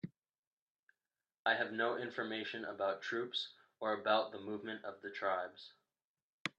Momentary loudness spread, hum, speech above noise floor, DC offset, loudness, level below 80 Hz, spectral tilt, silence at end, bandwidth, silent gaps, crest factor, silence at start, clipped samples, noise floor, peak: 12 LU; none; over 51 dB; under 0.1%; -39 LUFS; -90 dBFS; -4.5 dB/octave; 0.1 s; 9.4 kHz; 0.38-0.87 s, 1.38-1.45 s, 6.05-6.15 s, 6.22-6.45 s; 24 dB; 0.05 s; under 0.1%; under -90 dBFS; -18 dBFS